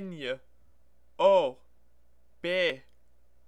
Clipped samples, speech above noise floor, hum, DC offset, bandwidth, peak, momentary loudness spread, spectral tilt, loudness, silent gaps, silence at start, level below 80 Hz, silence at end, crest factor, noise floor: under 0.1%; 41 dB; none; 0.2%; 9 kHz; -10 dBFS; 16 LU; -5 dB/octave; -28 LUFS; none; 0 s; -68 dBFS; 0.7 s; 20 dB; -68 dBFS